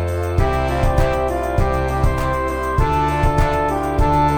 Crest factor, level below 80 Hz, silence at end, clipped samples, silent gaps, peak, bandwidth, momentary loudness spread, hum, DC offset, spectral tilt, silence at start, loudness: 14 dB; -22 dBFS; 0 s; under 0.1%; none; -2 dBFS; 17.5 kHz; 3 LU; none; 1%; -7 dB/octave; 0 s; -19 LUFS